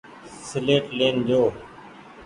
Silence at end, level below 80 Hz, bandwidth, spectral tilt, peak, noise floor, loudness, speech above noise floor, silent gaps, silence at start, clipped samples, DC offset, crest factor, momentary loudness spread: 0 s; -58 dBFS; 11 kHz; -5.5 dB/octave; -4 dBFS; -44 dBFS; -22 LUFS; 23 dB; none; 0.05 s; under 0.1%; under 0.1%; 20 dB; 21 LU